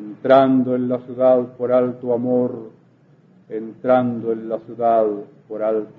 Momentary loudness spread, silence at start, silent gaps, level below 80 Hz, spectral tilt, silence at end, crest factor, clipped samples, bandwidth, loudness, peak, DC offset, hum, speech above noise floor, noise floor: 16 LU; 0 s; none; -68 dBFS; -10 dB/octave; 0.05 s; 18 dB; under 0.1%; 4.4 kHz; -19 LUFS; -2 dBFS; under 0.1%; none; 34 dB; -53 dBFS